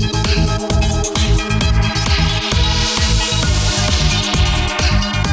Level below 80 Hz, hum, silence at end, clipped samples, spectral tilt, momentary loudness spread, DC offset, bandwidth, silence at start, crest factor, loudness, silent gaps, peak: -18 dBFS; none; 0 s; under 0.1%; -4 dB/octave; 2 LU; under 0.1%; 8 kHz; 0 s; 12 dB; -15 LUFS; none; -2 dBFS